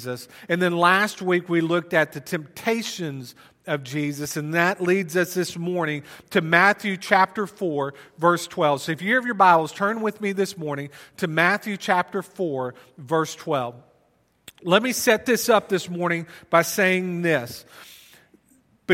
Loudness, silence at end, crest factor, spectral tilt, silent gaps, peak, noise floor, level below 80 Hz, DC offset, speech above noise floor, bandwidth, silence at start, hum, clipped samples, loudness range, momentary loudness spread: -22 LUFS; 0 s; 22 dB; -4.5 dB/octave; none; 0 dBFS; -64 dBFS; -68 dBFS; under 0.1%; 41 dB; 16.5 kHz; 0 s; none; under 0.1%; 4 LU; 13 LU